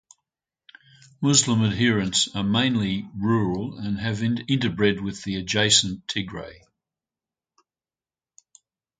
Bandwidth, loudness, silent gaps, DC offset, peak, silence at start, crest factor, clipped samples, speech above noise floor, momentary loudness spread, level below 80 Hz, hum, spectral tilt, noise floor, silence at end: 9.6 kHz; -22 LUFS; none; under 0.1%; -4 dBFS; 1.2 s; 22 dB; under 0.1%; over 67 dB; 11 LU; -52 dBFS; none; -3.5 dB/octave; under -90 dBFS; 2.45 s